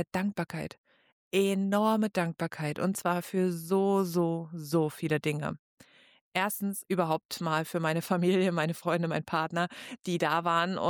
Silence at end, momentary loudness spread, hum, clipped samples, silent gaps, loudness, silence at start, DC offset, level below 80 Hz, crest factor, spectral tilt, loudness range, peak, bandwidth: 0 s; 8 LU; none; under 0.1%; 0.78-0.84 s, 1.12-1.31 s, 5.59-5.78 s, 6.21-6.32 s, 7.25-7.29 s; -30 LUFS; 0 s; under 0.1%; -70 dBFS; 16 dB; -5.5 dB/octave; 3 LU; -14 dBFS; 19.5 kHz